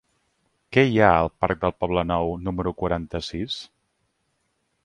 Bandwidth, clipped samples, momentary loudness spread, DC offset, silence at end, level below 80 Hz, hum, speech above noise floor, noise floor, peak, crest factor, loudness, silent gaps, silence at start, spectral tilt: 11 kHz; under 0.1%; 12 LU; under 0.1%; 1.2 s; -42 dBFS; none; 50 dB; -72 dBFS; 0 dBFS; 24 dB; -23 LUFS; none; 0.7 s; -7 dB/octave